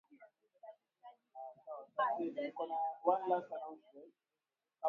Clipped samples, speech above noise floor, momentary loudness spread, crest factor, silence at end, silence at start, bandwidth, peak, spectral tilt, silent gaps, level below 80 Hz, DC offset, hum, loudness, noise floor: under 0.1%; over 51 dB; 24 LU; 24 dB; 0 s; 0.1 s; 4.7 kHz; -18 dBFS; -3 dB/octave; none; under -90 dBFS; under 0.1%; none; -39 LUFS; under -90 dBFS